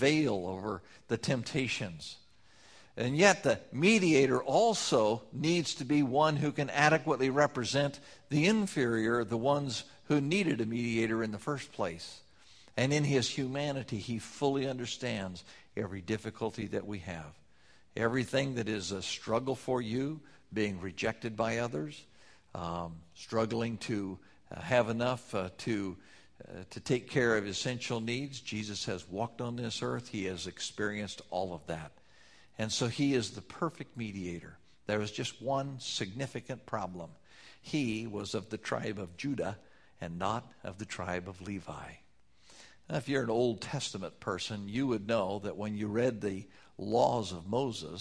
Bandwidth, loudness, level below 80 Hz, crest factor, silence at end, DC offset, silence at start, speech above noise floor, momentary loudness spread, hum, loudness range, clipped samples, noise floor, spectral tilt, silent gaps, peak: 11 kHz; -33 LUFS; -64 dBFS; 26 dB; 0 s; under 0.1%; 0 s; 32 dB; 15 LU; none; 9 LU; under 0.1%; -65 dBFS; -5 dB/octave; none; -8 dBFS